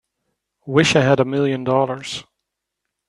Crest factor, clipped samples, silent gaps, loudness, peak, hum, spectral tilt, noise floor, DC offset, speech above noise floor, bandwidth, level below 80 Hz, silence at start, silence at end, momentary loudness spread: 20 dB; under 0.1%; none; -18 LUFS; 0 dBFS; none; -5 dB/octave; -80 dBFS; under 0.1%; 62 dB; 11.5 kHz; -56 dBFS; 0.65 s; 0.85 s; 14 LU